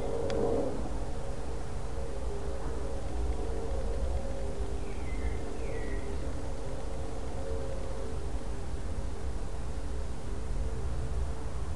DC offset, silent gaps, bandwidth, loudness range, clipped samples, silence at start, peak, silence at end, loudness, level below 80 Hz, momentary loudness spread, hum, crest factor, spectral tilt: 2%; none; 11.5 kHz; 2 LU; under 0.1%; 0 s; -18 dBFS; 0 s; -37 LUFS; -36 dBFS; 5 LU; none; 16 dB; -6.5 dB/octave